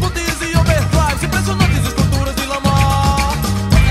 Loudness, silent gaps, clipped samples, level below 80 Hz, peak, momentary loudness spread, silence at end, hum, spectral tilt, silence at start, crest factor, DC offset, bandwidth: -15 LUFS; none; under 0.1%; -20 dBFS; 0 dBFS; 4 LU; 0 s; none; -5 dB/octave; 0 s; 14 dB; under 0.1%; 16 kHz